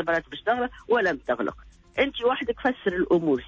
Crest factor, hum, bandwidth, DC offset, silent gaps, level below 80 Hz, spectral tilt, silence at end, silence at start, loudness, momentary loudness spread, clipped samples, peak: 14 dB; none; 7.6 kHz; under 0.1%; none; -52 dBFS; -6.5 dB/octave; 0 s; 0 s; -26 LUFS; 5 LU; under 0.1%; -10 dBFS